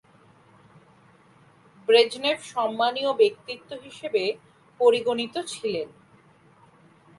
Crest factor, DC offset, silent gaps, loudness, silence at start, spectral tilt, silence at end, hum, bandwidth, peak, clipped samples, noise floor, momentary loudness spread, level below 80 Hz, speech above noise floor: 20 dB; under 0.1%; none; -24 LUFS; 1.9 s; -3 dB/octave; 1.3 s; none; 11.5 kHz; -6 dBFS; under 0.1%; -56 dBFS; 17 LU; -74 dBFS; 32 dB